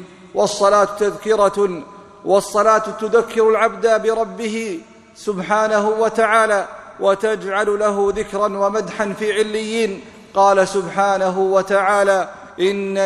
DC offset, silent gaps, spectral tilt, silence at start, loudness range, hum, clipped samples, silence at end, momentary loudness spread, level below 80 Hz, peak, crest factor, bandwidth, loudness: under 0.1%; none; -4 dB/octave; 0 s; 2 LU; none; under 0.1%; 0 s; 9 LU; -54 dBFS; 0 dBFS; 16 dB; 13 kHz; -17 LUFS